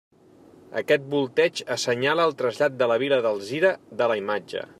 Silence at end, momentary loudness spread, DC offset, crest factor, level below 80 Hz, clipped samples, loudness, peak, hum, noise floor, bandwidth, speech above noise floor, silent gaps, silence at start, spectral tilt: 0.15 s; 7 LU; under 0.1%; 16 dB; -74 dBFS; under 0.1%; -24 LUFS; -8 dBFS; none; -52 dBFS; 14 kHz; 29 dB; none; 0.7 s; -4 dB/octave